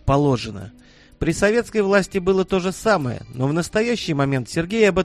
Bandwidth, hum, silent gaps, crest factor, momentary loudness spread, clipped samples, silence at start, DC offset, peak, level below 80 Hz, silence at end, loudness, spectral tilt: 13.5 kHz; none; none; 18 dB; 8 LU; under 0.1%; 0.05 s; under 0.1%; -2 dBFS; -40 dBFS; 0 s; -20 LUFS; -6 dB/octave